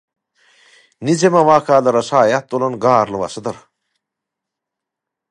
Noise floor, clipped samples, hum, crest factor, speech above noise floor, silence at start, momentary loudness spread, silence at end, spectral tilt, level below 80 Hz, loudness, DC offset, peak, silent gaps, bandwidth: -83 dBFS; under 0.1%; none; 16 dB; 68 dB; 1 s; 14 LU; 1.75 s; -5.5 dB/octave; -60 dBFS; -15 LUFS; under 0.1%; 0 dBFS; none; 11.5 kHz